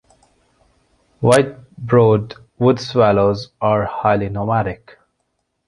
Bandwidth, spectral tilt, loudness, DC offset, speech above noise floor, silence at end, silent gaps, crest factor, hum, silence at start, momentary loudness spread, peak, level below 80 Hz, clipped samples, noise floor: 11.5 kHz; -6.5 dB/octave; -17 LUFS; under 0.1%; 55 dB; 0.95 s; none; 18 dB; none; 1.2 s; 11 LU; 0 dBFS; -46 dBFS; under 0.1%; -71 dBFS